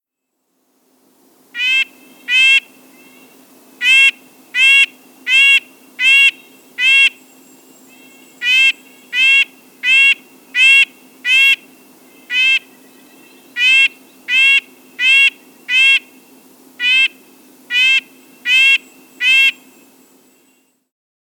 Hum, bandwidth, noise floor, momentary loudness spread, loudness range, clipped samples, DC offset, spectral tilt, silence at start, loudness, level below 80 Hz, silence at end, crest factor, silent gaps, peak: none; over 20 kHz; -72 dBFS; 11 LU; 3 LU; under 0.1%; under 0.1%; 3 dB/octave; 1.55 s; -11 LUFS; -88 dBFS; 1.75 s; 16 dB; none; 0 dBFS